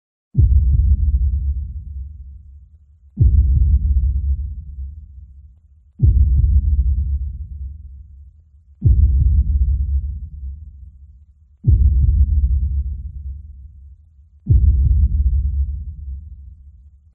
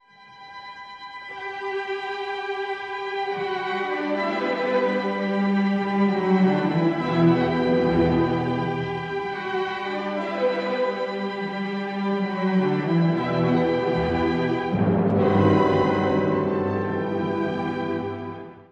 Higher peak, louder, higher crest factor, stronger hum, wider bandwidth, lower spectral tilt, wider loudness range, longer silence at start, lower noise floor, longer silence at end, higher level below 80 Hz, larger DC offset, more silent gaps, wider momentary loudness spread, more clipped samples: first, -4 dBFS vs -8 dBFS; first, -18 LUFS vs -23 LUFS; about the same, 14 dB vs 16 dB; neither; second, 0.5 kHz vs 7.4 kHz; first, -16 dB/octave vs -8 dB/octave; second, 1 LU vs 6 LU; first, 0.35 s vs 0.2 s; about the same, -49 dBFS vs -47 dBFS; first, 0.45 s vs 0.1 s; first, -18 dBFS vs -50 dBFS; neither; neither; first, 20 LU vs 9 LU; neither